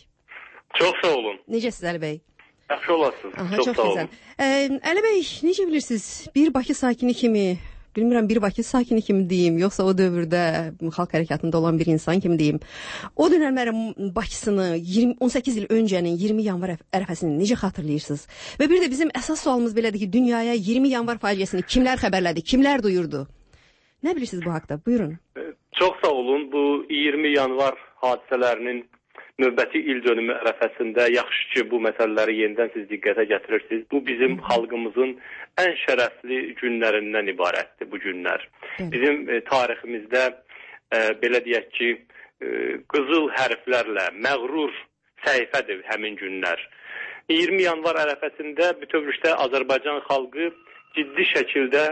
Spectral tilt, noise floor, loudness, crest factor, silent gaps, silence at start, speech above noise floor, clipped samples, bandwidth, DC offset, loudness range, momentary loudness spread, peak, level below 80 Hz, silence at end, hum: -5 dB/octave; -58 dBFS; -23 LUFS; 16 dB; none; 0.3 s; 35 dB; under 0.1%; 8.8 kHz; under 0.1%; 3 LU; 9 LU; -6 dBFS; -50 dBFS; 0 s; none